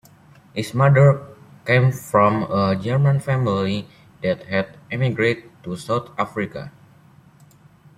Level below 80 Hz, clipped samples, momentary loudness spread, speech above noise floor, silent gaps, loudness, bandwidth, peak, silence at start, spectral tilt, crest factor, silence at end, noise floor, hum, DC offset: -56 dBFS; under 0.1%; 13 LU; 31 dB; none; -20 LUFS; 13 kHz; -2 dBFS; 0.55 s; -7.5 dB/octave; 18 dB; 1.3 s; -50 dBFS; none; under 0.1%